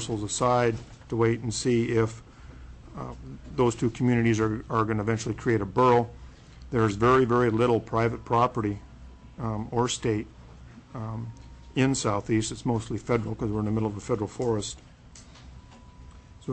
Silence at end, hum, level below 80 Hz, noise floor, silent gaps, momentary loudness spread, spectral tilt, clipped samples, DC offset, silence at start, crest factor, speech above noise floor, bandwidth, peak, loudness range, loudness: 0 s; none; -48 dBFS; -49 dBFS; none; 16 LU; -6 dB/octave; under 0.1%; under 0.1%; 0 s; 14 dB; 24 dB; 8.6 kHz; -12 dBFS; 6 LU; -26 LUFS